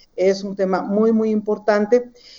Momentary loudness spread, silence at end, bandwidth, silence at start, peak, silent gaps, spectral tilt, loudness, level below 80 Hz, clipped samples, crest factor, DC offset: 4 LU; 0.3 s; 7.4 kHz; 0.15 s; -4 dBFS; none; -7 dB/octave; -19 LUFS; -62 dBFS; under 0.1%; 16 dB; under 0.1%